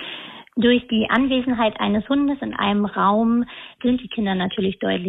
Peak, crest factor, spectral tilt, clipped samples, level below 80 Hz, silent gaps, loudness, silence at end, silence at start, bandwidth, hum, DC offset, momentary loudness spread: -4 dBFS; 16 dB; -8.5 dB/octave; under 0.1%; -50 dBFS; none; -21 LUFS; 0 s; 0 s; 4 kHz; none; under 0.1%; 6 LU